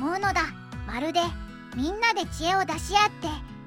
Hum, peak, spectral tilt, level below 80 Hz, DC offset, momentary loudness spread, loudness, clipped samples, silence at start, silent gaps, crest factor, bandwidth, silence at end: none; -8 dBFS; -3.5 dB/octave; -42 dBFS; under 0.1%; 12 LU; -26 LUFS; under 0.1%; 0 s; none; 20 dB; 16.5 kHz; 0 s